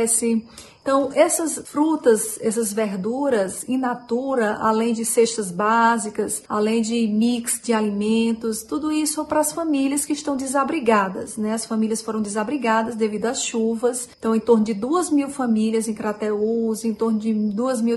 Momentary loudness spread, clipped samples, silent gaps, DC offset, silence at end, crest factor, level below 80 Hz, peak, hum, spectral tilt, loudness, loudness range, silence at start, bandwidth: 6 LU; under 0.1%; none; under 0.1%; 0 s; 18 dB; -60 dBFS; -4 dBFS; none; -4 dB/octave; -21 LUFS; 2 LU; 0 s; 12.5 kHz